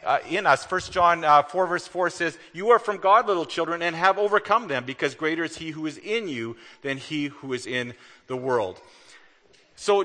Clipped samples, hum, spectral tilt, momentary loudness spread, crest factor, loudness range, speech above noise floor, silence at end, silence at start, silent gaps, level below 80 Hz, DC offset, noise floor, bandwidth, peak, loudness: under 0.1%; none; -4 dB/octave; 13 LU; 20 dB; 9 LU; 34 dB; 0 s; 0 s; none; -62 dBFS; under 0.1%; -58 dBFS; 9.8 kHz; -4 dBFS; -24 LUFS